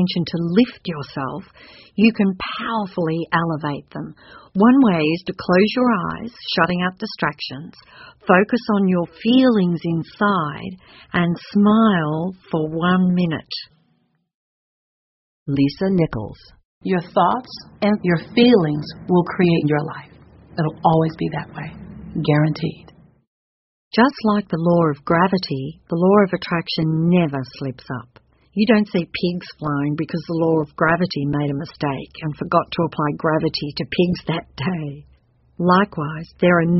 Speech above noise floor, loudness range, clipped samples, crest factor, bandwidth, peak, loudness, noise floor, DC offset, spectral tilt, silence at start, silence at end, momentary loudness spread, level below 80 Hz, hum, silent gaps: 46 dB; 4 LU; under 0.1%; 20 dB; 6 kHz; 0 dBFS; -19 LUFS; -65 dBFS; under 0.1%; -5.5 dB/octave; 0 s; 0 s; 14 LU; -52 dBFS; none; 14.34-15.46 s, 16.65-16.81 s, 23.27-23.91 s